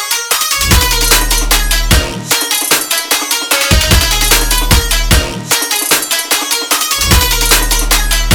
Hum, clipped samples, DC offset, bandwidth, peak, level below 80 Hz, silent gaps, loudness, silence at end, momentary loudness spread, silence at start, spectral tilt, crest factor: none; 0.3%; 0.3%; over 20 kHz; 0 dBFS; -16 dBFS; none; -10 LUFS; 0 s; 3 LU; 0 s; -2 dB/octave; 12 dB